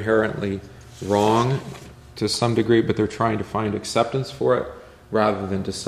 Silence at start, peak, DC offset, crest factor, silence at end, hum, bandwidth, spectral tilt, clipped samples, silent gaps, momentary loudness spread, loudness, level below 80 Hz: 0 s; -4 dBFS; under 0.1%; 18 dB; 0 s; none; 14.5 kHz; -5.5 dB/octave; under 0.1%; none; 15 LU; -22 LUFS; -50 dBFS